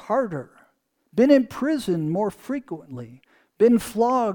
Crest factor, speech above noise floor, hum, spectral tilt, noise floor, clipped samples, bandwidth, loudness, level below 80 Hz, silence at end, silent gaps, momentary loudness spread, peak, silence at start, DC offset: 18 dB; 44 dB; none; -6.5 dB/octave; -66 dBFS; under 0.1%; 19 kHz; -22 LUFS; -58 dBFS; 0 s; none; 18 LU; -4 dBFS; 0.05 s; under 0.1%